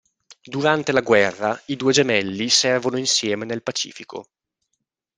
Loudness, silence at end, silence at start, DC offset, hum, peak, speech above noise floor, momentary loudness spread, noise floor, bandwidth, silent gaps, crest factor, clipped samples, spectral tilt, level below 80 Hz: -20 LUFS; 0.95 s; 0.45 s; under 0.1%; none; -2 dBFS; 57 dB; 13 LU; -78 dBFS; 10 kHz; none; 20 dB; under 0.1%; -3 dB/octave; -64 dBFS